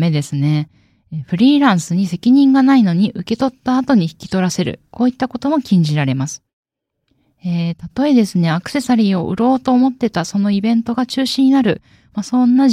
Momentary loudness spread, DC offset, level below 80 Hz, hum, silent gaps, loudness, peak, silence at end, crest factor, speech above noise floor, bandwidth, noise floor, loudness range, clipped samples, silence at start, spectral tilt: 11 LU; under 0.1%; -54 dBFS; none; 6.53-6.63 s; -15 LUFS; -2 dBFS; 0 s; 14 dB; 53 dB; 13.5 kHz; -68 dBFS; 5 LU; under 0.1%; 0 s; -6.5 dB/octave